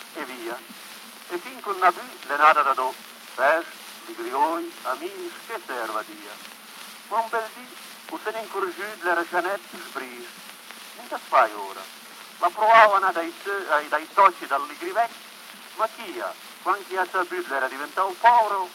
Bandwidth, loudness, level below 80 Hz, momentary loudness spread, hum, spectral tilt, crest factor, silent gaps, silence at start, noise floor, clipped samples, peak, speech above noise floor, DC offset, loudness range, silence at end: 16.5 kHz; -24 LUFS; -88 dBFS; 22 LU; none; -2 dB/octave; 24 dB; none; 0 s; -43 dBFS; under 0.1%; -2 dBFS; 19 dB; under 0.1%; 10 LU; 0 s